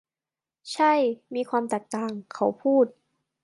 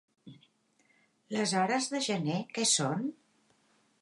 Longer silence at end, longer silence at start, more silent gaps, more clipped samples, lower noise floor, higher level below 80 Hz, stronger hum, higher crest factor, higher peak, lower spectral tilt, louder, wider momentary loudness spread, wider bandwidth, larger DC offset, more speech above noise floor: second, 0.55 s vs 0.9 s; first, 0.65 s vs 0.25 s; neither; neither; first, under -90 dBFS vs -71 dBFS; about the same, -80 dBFS vs -84 dBFS; neither; about the same, 16 dB vs 18 dB; first, -10 dBFS vs -16 dBFS; first, -5 dB/octave vs -3 dB/octave; first, -25 LUFS vs -30 LUFS; about the same, 10 LU vs 9 LU; about the same, 11.5 kHz vs 11.5 kHz; neither; first, over 65 dB vs 40 dB